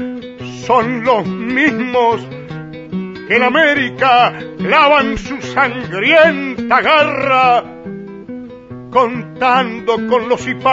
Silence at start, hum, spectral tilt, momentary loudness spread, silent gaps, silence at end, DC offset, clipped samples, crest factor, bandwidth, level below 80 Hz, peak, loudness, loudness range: 0 s; none; -5 dB/octave; 19 LU; none; 0 s; under 0.1%; under 0.1%; 14 dB; 8 kHz; -46 dBFS; 0 dBFS; -13 LUFS; 4 LU